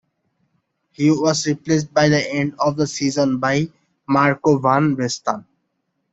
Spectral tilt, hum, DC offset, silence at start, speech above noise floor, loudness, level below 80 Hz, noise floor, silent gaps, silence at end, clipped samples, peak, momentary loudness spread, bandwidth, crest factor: -5.5 dB/octave; none; under 0.1%; 1 s; 54 dB; -19 LUFS; -58 dBFS; -72 dBFS; none; 0.7 s; under 0.1%; -2 dBFS; 6 LU; 8 kHz; 18 dB